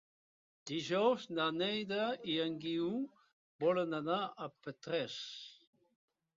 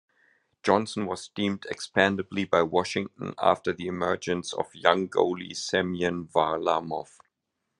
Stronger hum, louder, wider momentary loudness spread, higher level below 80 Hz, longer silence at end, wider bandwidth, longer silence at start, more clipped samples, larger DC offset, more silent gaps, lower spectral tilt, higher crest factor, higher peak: neither; second, -37 LUFS vs -27 LUFS; first, 13 LU vs 9 LU; second, -82 dBFS vs -68 dBFS; about the same, 0.85 s vs 0.75 s; second, 7.4 kHz vs 11.5 kHz; about the same, 0.65 s vs 0.65 s; neither; neither; first, 3.33-3.59 s vs none; second, -3 dB/octave vs -4.5 dB/octave; about the same, 20 dB vs 24 dB; second, -20 dBFS vs -2 dBFS